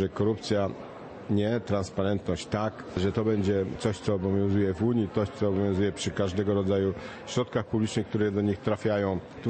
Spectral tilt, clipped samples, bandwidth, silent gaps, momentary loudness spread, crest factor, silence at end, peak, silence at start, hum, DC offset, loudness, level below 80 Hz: -6.5 dB/octave; under 0.1%; 8.8 kHz; none; 5 LU; 16 dB; 0 s; -12 dBFS; 0 s; none; under 0.1%; -28 LUFS; -54 dBFS